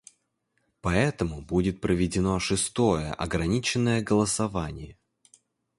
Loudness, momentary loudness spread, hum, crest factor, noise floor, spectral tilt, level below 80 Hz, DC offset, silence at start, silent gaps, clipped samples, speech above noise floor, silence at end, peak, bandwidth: -26 LUFS; 9 LU; none; 20 dB; -75 dBFS; -5 dB/octave; -44 dBFS; under 0.1%; 0.85 s; none; under 0.1%; 49 dB; 0.85 s; -8 dBFS; 11.5 kHz